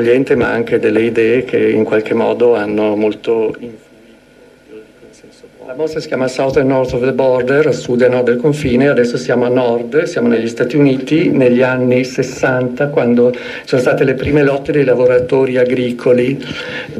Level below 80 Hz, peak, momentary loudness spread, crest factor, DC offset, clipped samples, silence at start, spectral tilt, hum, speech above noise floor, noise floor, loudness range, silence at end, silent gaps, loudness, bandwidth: -44 dBFS; 0 dBFS; 6 LU; 12 dB; under 0.1%; under 0.1%; 0 s; -6.5 dB/octave; none; 31 dB; -44 dBFS; 6 LU; 0 s; none; -13 LUFS; 12 kHz